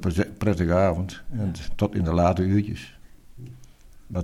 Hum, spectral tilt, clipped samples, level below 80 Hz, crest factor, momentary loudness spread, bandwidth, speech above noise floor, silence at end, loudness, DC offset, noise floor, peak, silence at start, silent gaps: none; -8 dB/octave; under 0.1%; -40 dBFS; 18 dB; 23 LU; 13 kHz; 23 dB; 0 s; -24 LUFS; under 0.1%; -47 dBFS; -6 dBFS; 0 s; none